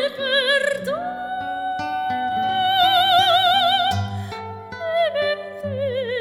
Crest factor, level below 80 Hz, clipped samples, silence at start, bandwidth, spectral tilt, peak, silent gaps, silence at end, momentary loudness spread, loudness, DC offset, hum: 16 dB; -58 dBFS; under 0.1%; 0 s; 14.5 kHz; -3.5 dB/octave; -6 dBFS; none; 0 s; 14 LU; -20 LUFS; under 0.1%; none